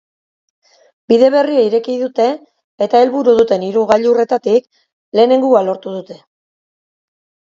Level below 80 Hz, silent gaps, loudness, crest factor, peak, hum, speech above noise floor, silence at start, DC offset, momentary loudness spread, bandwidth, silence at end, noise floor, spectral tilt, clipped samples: -62 dBFS; 2.64-2.78 s, 4.92-5.12 s; -13 LUFS; 14 dB; 0 dBFS; none; over 77 dB; 1.1 s; under 0.1%; 9 LU; 7.6 kHz; 1.4 s; under -90 dBFS; -6 dB/octave; under 0.1%